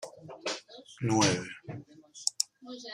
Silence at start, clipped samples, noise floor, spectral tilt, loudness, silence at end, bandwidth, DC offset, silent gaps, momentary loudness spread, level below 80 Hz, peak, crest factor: 0 s; under 0.1%; -51 dBFS; -3.5 dB/octave; -31 LUFS; 0 s; 15 kHz; under 0.1%; none; 20 LU; -68 dBFS; -8 dBFS; 26 dB